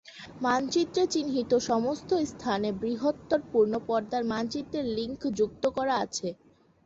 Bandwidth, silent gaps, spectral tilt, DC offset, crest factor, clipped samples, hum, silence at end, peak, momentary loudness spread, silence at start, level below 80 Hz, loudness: 8 kHz; none; -4.5 dB/octave; under 0.1%; 16 dB; under 0.1%; none; 0.5 s; -14 dBFS; 6 LU; 0.05 s; -60 dBFS; -29 LUFS